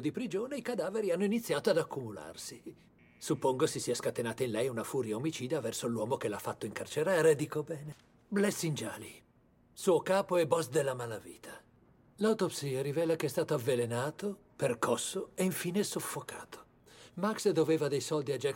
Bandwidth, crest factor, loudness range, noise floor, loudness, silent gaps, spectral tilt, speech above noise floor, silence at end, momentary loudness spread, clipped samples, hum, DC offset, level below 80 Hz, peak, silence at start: 17 kHz; 20 dB; 2 LU; -66 dBFS; -33 LUFS; none; -5 dB/octave; 33 dB; 0 s; 15 LU; under 0.1%; none; under 0.1%; -72 dBFS; -14 dBFS; 0 s